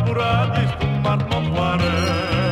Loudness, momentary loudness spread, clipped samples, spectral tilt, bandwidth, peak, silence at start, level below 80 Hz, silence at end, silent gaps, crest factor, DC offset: -20 LUFS; 2 LU; under 0.1%; -6.5 dB/octave; 12.5 kHz; -6 dBFS; 0 s; -36 dBFS; 0 s; none; 14 dB; under 0.1%